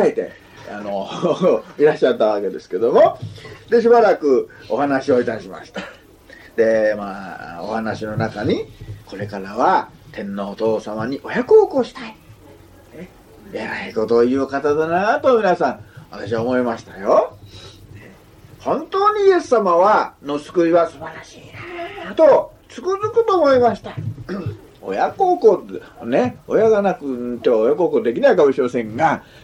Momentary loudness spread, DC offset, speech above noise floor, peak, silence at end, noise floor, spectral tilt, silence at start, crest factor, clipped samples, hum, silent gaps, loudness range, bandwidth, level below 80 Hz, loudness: 18 LU; under 0.1%; 27 dB; -2 dBFS; 0.2 s; -44 dBFS; -6.5 dB/octave; 0 s; 16 dB; under 0.1%; none; none; 5 LU; 10 kHz; -54 dBFS; -18 LUFS